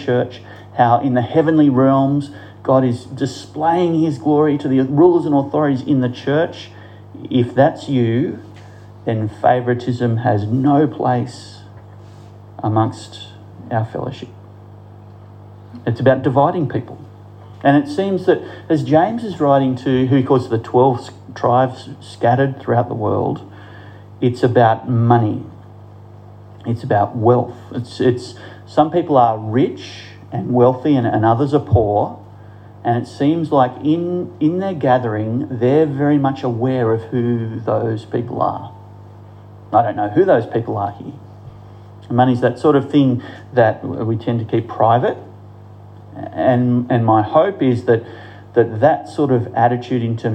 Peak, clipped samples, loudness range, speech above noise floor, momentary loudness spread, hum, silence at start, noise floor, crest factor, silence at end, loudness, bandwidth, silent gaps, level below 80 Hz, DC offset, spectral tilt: -2 dBFS; under 0.1%; 4 LU; 23 dB; 14 LU; 50 Hz at -40 dBFS; 0 s; -39 dBFS; 16 dB; 0 s; -17 LUFS; 9 kHz; none; -54 dBFS; under 0.1%; -8.5 dB/octave